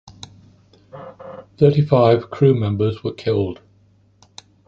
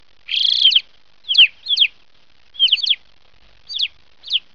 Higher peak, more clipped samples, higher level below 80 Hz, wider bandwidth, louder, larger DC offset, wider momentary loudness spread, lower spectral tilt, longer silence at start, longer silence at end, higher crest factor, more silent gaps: about the same, -2 dBFS vs -2 dBFS; neither; first, -48 dBFS vs -62 dBFS; about the same, 7.6 kHz vs 7.4 kHz; second, -18 LUFS vs -14 LUFS; second, under 0.1% vs 0.5%; first, 24 LU vs 11 LU; first, -8.5 dB/octave vs 3.5 dB/octave; second, 0.05 s vs 0.3 s; first, 1.15 s vs 0.15 s; about the same, 18 dB vs 18 dB; neither